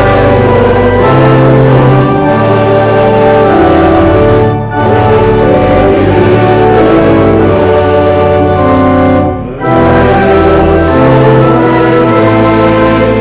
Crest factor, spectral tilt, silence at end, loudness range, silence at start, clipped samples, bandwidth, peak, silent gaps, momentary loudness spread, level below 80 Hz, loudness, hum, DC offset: 6 dB; -11.5 dB/octave; 0 s; 1 LU; 0 s; 1%; 4 kHz; 0 dBFS; none; 2 LU; -22 dBFS; -6 LUFS; none; under 0.1%